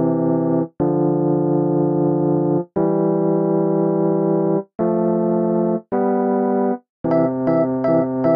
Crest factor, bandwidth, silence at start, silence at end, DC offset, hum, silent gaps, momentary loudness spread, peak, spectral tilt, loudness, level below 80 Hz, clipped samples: 12 dB; 5 kHz; 0 s; 0 s; under 0.1%; none; 6.89-7.04 s; 3 LU; -6 dBFS; -13.5 dB/octave; -19 LUFS; -58 dBFS; under 0.1%